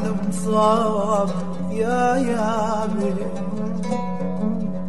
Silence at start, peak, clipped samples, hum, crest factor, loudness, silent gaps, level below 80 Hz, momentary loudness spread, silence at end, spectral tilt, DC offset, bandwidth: 0 s; -4 dBFS; under 0.1%; none; 16 dB; -22 LUFS; none; -50 dBFS; 8 LU; 0 s; -6.5 dB/octave; 4%; 12 kHz